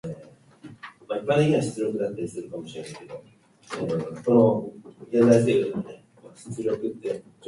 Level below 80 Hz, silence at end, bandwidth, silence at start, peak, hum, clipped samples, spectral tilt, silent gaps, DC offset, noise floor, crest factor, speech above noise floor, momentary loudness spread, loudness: -64 dBFS; 0 s; 11.5 kHz; 0.05 s; -6 dBFS; none; under 0.1%; -7 dB/octave; none; under 0.1%; -50 dBFS; 20 dB; 26 dB; 24 LU; -24 LUFS